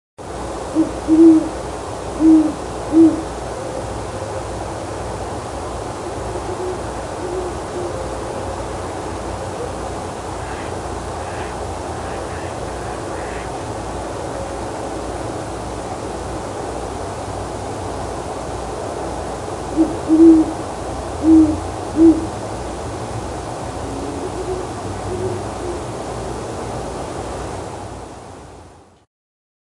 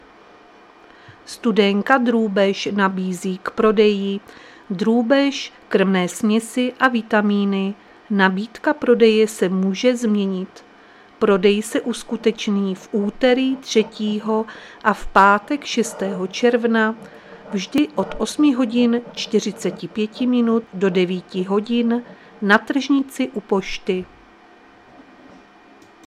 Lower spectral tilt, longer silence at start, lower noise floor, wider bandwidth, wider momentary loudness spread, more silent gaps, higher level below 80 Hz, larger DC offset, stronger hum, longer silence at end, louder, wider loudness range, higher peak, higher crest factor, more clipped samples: about the same, -6 dB/octave vs -5.5 dB/octave; second, 0.2 s vs 1.1 s; second, -43 dBFS vs -48 dBFS; second, 11.5 kHz vs 13.5 kHz; first, 14 LU vs 10 LU; neither; first, -36 dBFS vs -50 dBFS; neither; neither; second, 0.85 s vs 2 s; about the same, -21 LUFS vs -19 LUFS; first, 11 LU vs 3 LU; about the same, 0 dBFS vs 0 dBFS; about the same, 20 dB vs 20 dB; neither